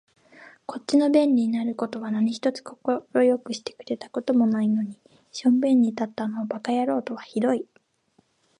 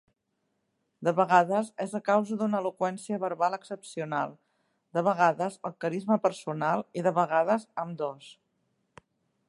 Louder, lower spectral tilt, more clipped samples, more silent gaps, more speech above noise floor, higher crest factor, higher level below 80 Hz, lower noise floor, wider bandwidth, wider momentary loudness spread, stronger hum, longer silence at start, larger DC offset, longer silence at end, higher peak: first, -24 LUFS vs -28 LUFS; about the same, -6 dB/octave vs -6 dB/octave; neither; neither; second, 42 dB vs 51 dB; second, 16 dB vs 22 dB; about the same, -76 dBFS vs -80 dBFS; second, -66 dBFS vs -78 dBFS; about the same, 10.5 kHz vs 11.5 kHz; about the same, 14 LU vs 12 LU; neither; second, 0.4 s vs 1 s; neither; second, 0.95 s vs 1.15 s; about the same, -8 dBFS vs -6 dBFS